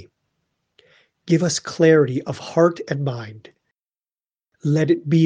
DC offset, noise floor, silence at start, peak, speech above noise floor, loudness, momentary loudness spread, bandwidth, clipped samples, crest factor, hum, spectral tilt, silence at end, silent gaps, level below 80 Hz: under 0.1%; under -90 dBFS; 1.25 s; -2 dBFS; over 72 dB; -20 LUFS; 12 LU; 9.8 kHz; under 0.1%; 18 dB; none; -6 dB/octave; 0 s; none; -64 dBFS